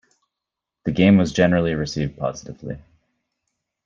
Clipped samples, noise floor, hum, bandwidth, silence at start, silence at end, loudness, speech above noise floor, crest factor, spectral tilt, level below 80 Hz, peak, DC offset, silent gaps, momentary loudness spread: under 0.1%; -85 dBFS; none; 7.6 kHz; 0.85 s; 1.05 s; -20 LUFS; 65 dB; 18 dB; -6.5 dB/octave; -48 dBFS; -4 dBFS; under 0.1%; none; 19 LU